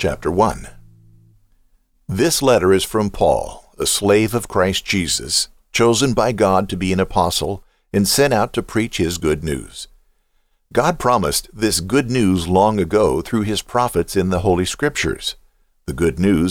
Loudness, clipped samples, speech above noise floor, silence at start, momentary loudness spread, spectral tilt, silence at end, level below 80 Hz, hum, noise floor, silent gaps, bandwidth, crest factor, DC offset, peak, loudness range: -18 LUFS; under 0.1%; 45 dB; 0 s; 10 LU; -4.5 dB/octave; 0 s; -38 dBFS; none; -62 dBFS; none; 18.5 kHz; 16 dB; under 0.1%; -2 dBFS; 3 LU